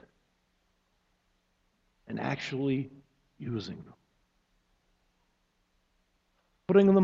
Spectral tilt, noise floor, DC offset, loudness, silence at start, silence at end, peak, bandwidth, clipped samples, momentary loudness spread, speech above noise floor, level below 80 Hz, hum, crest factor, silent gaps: -8 dB/octave; -74 dBFS; under 0.1%; -30 LUFS; 2.1 s; 0 s; -10 dBFS; 7.4 kHz; under 0.1%; 20 LU; 47 dB; -68 dBFS; none; 24 dB; none